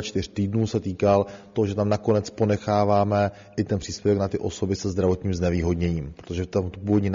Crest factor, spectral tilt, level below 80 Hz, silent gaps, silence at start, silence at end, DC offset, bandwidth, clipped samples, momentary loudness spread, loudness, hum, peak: 18 dB; -7 dB/octave; -44 dBFS; none; 0 s; 0 s; under 0.1%; 7.4 kHz; under 0.1%; 6 LU; -24 LUFS; none; -6 dBFS